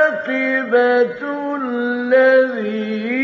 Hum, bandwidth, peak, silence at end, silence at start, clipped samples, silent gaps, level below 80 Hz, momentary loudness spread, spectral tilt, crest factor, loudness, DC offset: none; 6 kHz; -4 dBFS; 0 s; 0 s; under 0.1%; none; -70 dBFS; 10 LU; -3 dB/octave; 14 dB; -17 LUFS; under 0.1%